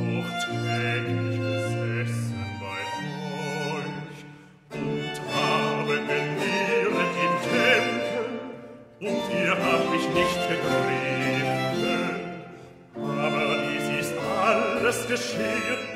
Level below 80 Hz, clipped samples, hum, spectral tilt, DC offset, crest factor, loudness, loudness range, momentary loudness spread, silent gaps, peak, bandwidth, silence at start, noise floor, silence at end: -60 dBFS; under 0.1%; none; -5 dB/octave; under 0.1%; 20 dB; -26 LUFS; 6 LU; 12 LU; none; -6 dBFS; 16 kHz; 0 s; -47 dBFS; 0 s